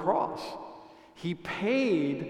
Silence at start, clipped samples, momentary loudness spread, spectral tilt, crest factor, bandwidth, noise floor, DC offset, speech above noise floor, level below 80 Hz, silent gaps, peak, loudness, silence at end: 0 s; under 0.1%; 18 LU; -6.5 dB/octave; 18 dB; 12.5 kHz; -51 dBFS; under 0.1%; 22 dB; -66 dBFS; none; -12 dBFS; -30 LUFS; 0 s